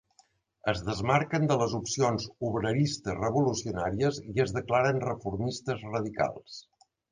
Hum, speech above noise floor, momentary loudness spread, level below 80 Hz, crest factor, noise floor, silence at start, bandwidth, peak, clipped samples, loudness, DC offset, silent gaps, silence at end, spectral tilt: none; 38 dB; 7 LU; -54 dBFS; 20 dB; -66 dBFS; 0.65 s; 9.8 kHz; -10 dBFS; under 0.1%; -29 LUFS; under 0.1%; none; 0.5 s; -5.5 dB/octave